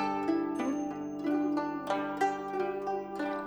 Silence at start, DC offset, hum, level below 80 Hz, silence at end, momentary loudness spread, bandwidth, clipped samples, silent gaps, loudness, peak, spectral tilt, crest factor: 0 s; under 0.1%; 50 Hz at -80 dBFS; -68 dBFS; 0 s; 5 LU; over 20 kHz; under 0.1%; none; -33 LUFS; -16 dBFS; -5.5 dB/octave; 16 dB